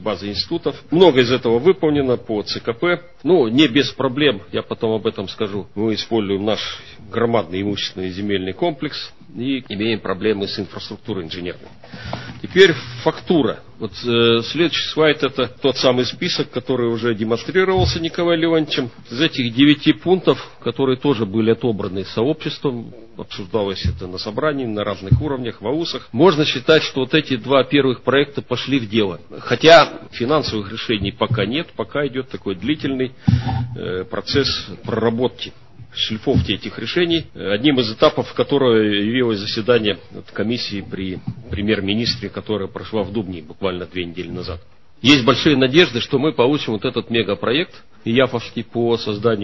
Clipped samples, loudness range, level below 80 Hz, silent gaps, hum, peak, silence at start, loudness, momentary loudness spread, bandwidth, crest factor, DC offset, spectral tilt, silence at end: under 0.1%; 6 LU; -40 dBFS; none; none; 0 dBFS; 0 s; -18 LUFS; 13 LU; 7.6 kHz; 18 dB; 0.7%; -6 dB/octave; 0 s